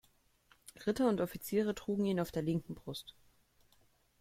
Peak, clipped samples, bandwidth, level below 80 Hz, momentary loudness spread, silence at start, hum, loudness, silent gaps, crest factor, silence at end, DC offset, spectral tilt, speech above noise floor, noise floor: -18 dBFS; under 0.1%; 16.5 kHz; -64 dBFS; 13 LU; 0.75 s; none; -36 LUFS; none; 20 dB; 1.1 s; under 0.1%; -6.5 dB/octave; 35 dB; -70 dBFS